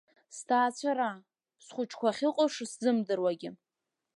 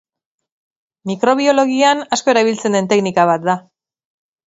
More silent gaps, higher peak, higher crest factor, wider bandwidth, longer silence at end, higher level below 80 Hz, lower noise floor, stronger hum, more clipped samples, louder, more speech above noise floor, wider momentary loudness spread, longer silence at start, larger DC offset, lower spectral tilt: neither; second, -14 dBFS vs 0 dBFS; about the same, 18 dB vs 16 dB; first, 11.5 kHz vs 8 kHz; second, 0.6 s vs 0.9 s; second, -86 dBFS vs -66 dBFS; first, -88 dBFS vs -81 dBFS; neither; neither; second, -31 LUFS vs -15 LUFS; second, 57 dB vs 66 dB; first, 16 LU vs 8 LU; second, 0.3 s vs 1.05 s; neither; about the same, -4 dB/octave vs -4.5 dB/octave